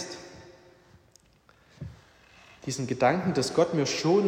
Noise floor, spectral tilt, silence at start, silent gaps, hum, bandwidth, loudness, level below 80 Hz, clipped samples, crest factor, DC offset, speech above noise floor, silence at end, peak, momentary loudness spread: -61 dBFS; -5 dB/octave; 0 s; none; none; 15.5 kHz; -27 LUFS; -62 dBFS; under 0.1%; 20 dB; under 0.1%; 36 dB; 0 s; -10 dBFS; 21 LU